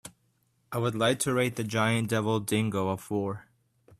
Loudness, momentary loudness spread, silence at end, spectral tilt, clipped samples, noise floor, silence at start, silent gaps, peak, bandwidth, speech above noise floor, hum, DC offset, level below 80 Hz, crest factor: -28 LUFS; 9 LU; 0.6 s; -5 dB/octave; under 0.1%; -71 dBFS; 0.05 s; none; -10 dBFS; 14.5 kHz; 43 dB; none; under 0.1%; -64 dBFS; 18 dB